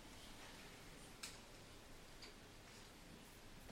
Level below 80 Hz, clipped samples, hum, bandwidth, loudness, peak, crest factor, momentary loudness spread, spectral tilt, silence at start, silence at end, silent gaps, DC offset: -66 dBFS; under 0.1%; none; 16 kHz; -58 LUFS; -34 dBFS; 24 dB; 6 LU; -3 dB/octave; 0 s; 0 s; none; under 0.1%